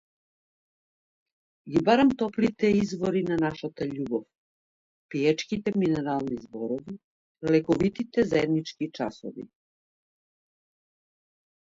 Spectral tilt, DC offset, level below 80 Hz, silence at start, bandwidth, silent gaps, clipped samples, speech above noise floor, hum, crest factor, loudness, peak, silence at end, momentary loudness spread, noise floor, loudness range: -6.5 dB/octave; under 0.1%; -60 dBFS; 1.65 s; 7.8 kHz; 4.38-5.09 s, 7.04-7.35 s; under 0.1%; over 64 dB; none; 22 dB; -27 LUFS; -6 dBFS; 2.15 s; 12 LU; under -90 dBFS; 4 LU